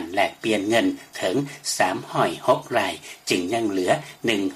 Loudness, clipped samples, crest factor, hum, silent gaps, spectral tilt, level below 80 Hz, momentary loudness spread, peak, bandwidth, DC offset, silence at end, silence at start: -23 LUFS; under 0.1%; 18 dB; none; none; -4 dB/octave; -64 dBFS; 5 LU; -4 dBFS; 15 kHz; under 0.1%; 0 s; 0 s